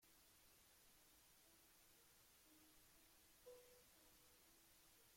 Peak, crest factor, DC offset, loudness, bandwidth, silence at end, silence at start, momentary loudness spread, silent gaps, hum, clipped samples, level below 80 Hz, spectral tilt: -54 dBFS; 18 dB; under 0.1%; -68 LUFS; 16.5 kHz; 0 s; 0 s; 4 LU; none; none; under 0.1%; -86 dBFS; -2 dB/octave